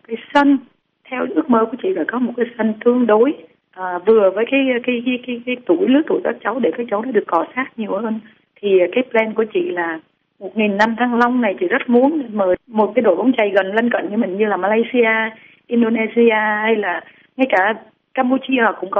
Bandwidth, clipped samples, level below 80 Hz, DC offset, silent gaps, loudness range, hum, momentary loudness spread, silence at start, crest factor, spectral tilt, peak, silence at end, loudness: 6.8 kHz; under 0.1%; -62 dBFS; under 0.1%; none; 3 LU; none; 9 LU; 0.1 s; 16 dB; -3.5 dB/octave; -2 dBFS; 0 s; -17 LUFS